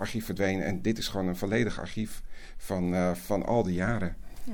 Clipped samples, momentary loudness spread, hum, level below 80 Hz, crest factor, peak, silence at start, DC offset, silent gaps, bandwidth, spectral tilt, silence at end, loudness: under 0.1%; 10 LU; none; -44 dBFS; 16 dB; -14 dBFS; 0 s; under 0.1%; none; 19 kHz; -6 dB/octave; 0 s; -30 LUFS